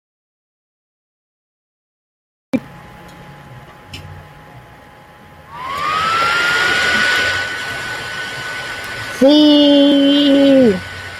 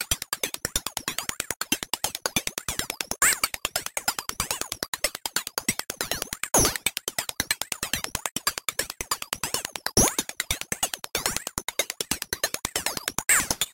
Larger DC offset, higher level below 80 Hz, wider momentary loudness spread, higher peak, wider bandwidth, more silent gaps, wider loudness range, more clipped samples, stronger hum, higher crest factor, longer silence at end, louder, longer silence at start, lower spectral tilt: neither; about the same, -50 dBFS vs -46 dBFS; first, 15 LU vs 9 LU; about the same, -2 dBFS vs -2 dBFS; second, 14 kHz vs 17 kHz; second, none vs 4.88-4.93 s, 8.31-8.35 s; first, 19 LU vs 2 LU; neither; neither; second, 16 dB vs 26 dB; about the same, 0 s vs 0 s; first, -14 LUFS vs -26 LUFS; first, 2.55 s vs 0 s; first, -4 dB/octave vs -1 dB/octave